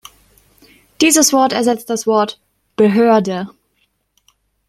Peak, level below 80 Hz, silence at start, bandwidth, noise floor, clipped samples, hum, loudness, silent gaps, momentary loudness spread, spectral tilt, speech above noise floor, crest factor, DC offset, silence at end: 0 dBFS; -58 dBFS; 1 s; 15.5 kHz; -64 dBFS; under 0.1%; none; -14 LUFS; none; 13 LU; -3.5 dB/octave; 51 dB; 16 dB; under 0.1%; 1.2 s